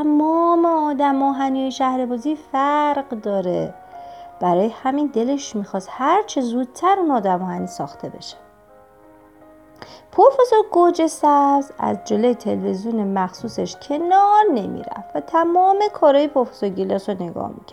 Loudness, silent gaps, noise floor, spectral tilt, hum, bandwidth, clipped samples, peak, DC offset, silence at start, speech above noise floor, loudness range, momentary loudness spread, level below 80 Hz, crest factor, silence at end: -19 LUFS; none; -49 dBFS; -6 dB/octave; none; 13 kHz; under 0.1%; -2 dBFS; under 0.1%; 0 s; 30 dB; 5 LU; 14 LU; -62 dBFS; 18 dB; 0.15 s